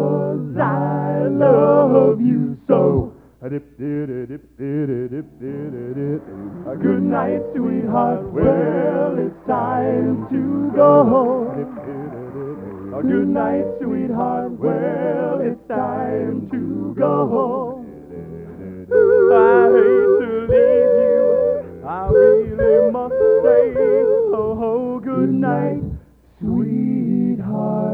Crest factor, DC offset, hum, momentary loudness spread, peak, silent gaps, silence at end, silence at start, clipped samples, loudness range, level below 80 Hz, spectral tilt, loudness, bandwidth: 16 dB; under 0.1%; none; 17 LU; 0 dBFS; none; 0 s; 0 s; under 0.1%; 8 LU; -44 dBFS; -11 dB/octave; -17 LUFS; 4.3 kHz